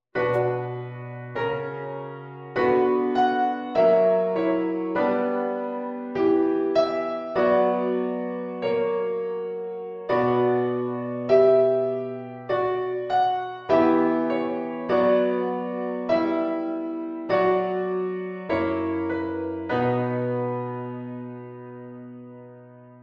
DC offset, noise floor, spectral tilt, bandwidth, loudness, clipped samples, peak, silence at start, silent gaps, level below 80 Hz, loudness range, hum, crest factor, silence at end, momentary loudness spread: under 0.1%; -46 dBFS; -8.5 dB/octave; 6.6 kHz; -24 LUFS; under 0.1%; -6 dBFS; 0.15 s; none; -62 dBFS; 4 LU; none; 18 dB; 0.05 s; 14 LU